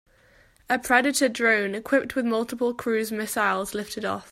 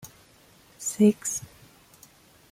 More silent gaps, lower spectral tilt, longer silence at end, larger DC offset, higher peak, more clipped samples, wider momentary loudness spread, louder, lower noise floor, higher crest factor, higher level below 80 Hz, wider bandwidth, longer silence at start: neither; second, -3 dB/octave vs -5.5 dB/octave; second, 0.1 s vs 1.05 s; neither; first, -4 dBFS vs -8 dBFS; neither; second, 9 LU vs 14 LU; about the same, -24 LUFS vs -25 LUFS; about the same, -58 dBFS vs -57 dBFS; about the same, 20 dB vs 20 dB; first, -60 dBFS vs -66 dBFS; about the same, 16 kHz vs 16 kHz; first, 0.7 s vs 0.05 s